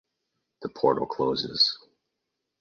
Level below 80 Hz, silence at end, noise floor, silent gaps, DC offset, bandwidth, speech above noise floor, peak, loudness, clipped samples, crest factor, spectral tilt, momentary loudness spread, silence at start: -64 dBFS; 0.85 s; -83 dBFS; none; under 0.1%; 7.2 kHz; 57 dB; -8 dBFS; -25 LUFS; under 0.1%; 22 dB; -5 dB/octave; 17 LU; 0.6 s